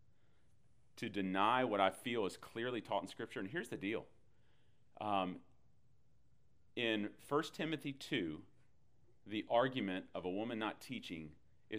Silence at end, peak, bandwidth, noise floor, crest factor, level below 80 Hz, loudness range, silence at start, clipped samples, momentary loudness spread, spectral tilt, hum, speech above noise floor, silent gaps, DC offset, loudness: 0 s; -18 dBFS; 15.5 kHz; -75 dBFS; 24 dB; -76 dBFS; 6 LU; 0.95 s; under 0.1%; 12 LU; -5 dB/octave; none; 35 dB; none; under 0.1%; -40 LUFS